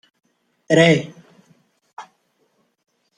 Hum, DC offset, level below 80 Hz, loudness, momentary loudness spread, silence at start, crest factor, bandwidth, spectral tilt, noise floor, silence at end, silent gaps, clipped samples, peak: none; under 0.1%; -62 dBFS; -16 LUFS; 27 LU; 0.7 s; 22 dB; 10 kHz; -5.5 dB/octave; -66 dBFS; 1.15 s; 1.93-1.97 s; under 0.1%; -2 dBFS